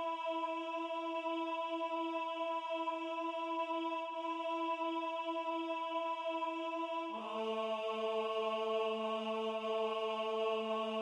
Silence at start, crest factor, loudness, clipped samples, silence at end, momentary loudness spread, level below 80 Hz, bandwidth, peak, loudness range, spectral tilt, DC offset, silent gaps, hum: 0 s; 14 dB; -38 LUFS; under 0.1%; 0 s; 3 LU; under -90 dBFS; 10.5 kHz; -26 dBFS; 2 LU; -4.5 dB/octave; under 0.1%; none; none